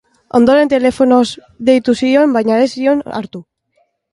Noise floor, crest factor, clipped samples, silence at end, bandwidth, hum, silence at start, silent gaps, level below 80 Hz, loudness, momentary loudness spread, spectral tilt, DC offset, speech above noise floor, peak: -61 dBFS; 14 dB; under 0.1%; 0.7 s; 11.5 kHz; none; 0.35 s; none; -50 dBFS; -12 LUFS; 12 LU; -5.5 dB/octave; under 0.1%; 49 dB; 0 dBFS